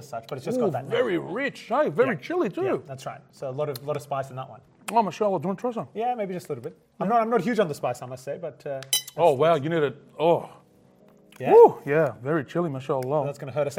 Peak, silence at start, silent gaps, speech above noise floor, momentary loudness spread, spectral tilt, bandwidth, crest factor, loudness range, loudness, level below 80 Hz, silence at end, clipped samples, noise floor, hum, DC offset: -4 dBFS; 0 s; none; 32 dB; 15 LU; -5 dB/octave; 16.5 kHz; 22 dB; 7 LU; -25 LUFS; -72 dBFS; 0 s; under 0.1%; -56 dBFS; none; under 0.1%